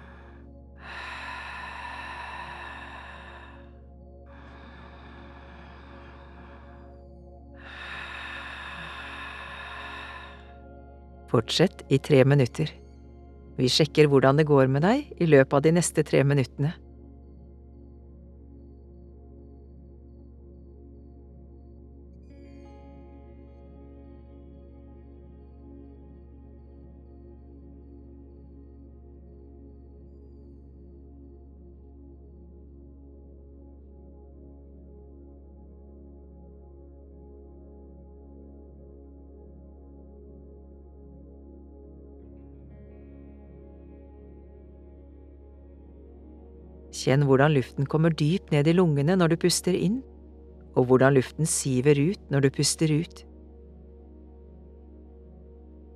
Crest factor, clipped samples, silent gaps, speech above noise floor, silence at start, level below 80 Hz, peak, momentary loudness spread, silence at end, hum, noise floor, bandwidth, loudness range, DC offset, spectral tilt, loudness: 24 dB; under 0.1%; none; 26 dB; 0.8 s; -50 dBFS; -4 dBFS; 28 LU; 2.75 s; none; -48 dBFS; 13.5 kHz; 27 LU; under 0.1%; -5.5 dB/octave; -24 LUFS